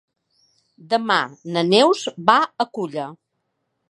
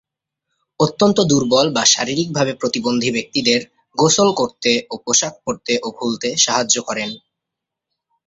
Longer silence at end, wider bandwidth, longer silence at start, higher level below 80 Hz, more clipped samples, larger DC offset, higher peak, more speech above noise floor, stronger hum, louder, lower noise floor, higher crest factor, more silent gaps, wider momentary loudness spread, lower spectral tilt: second, 0.75 s vs 1.1 s; first, 11.5 kHz vs 8.2 kHz; about the same, 0.9 s vs 0.8 s; second, -74 dBFS vs -56 dBFS; neither; neither; about the same, 0 dBFS vs 0 dBFS; second, 55 dB vs 65 dB; neither; about the same, -19 LUFS vs -17 LUFS; second, -74 dBFS vs -83 dBFS; about the same, 20 dB vs 18 dB; neither; about the same, 12 LU vs 10 LU; first, -4.5 dB/octave vs -3 dB/octave